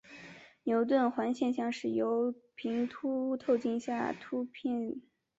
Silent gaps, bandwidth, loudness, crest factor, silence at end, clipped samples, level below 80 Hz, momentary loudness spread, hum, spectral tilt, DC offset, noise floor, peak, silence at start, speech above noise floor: none; 7.8 kHz; -33 LUFS; 18 dB; 0.4 s; under 0.1%; -76 dBFS; 12 LU; none; -6 dB/octave; under 0.1%; -53 dBFS; -16 dBFS; 0.1 s; 21 dB